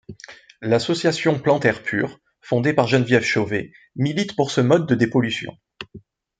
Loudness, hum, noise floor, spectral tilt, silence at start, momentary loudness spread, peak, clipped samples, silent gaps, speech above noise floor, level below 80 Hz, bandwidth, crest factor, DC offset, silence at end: -20 LUFS; none; -42 dBFS; -6 dB/octave; 0.1 s; 19 LU; -2 dBFS; under 0.1%; none; 22 dB; -60 dBFS; 9.4 kHz; 20 dB; under 0.1%; 0.4 s